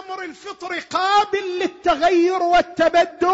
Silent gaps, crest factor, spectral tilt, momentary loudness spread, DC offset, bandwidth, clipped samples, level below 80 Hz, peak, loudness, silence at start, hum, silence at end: none; 12 dB; -3.5 dB/octave; 14 LU; under 0.1%; 8 kHz; under 0.1%; -50 dBFS; -8 dBFS; -18 LUFS; 0 s; none; 0 s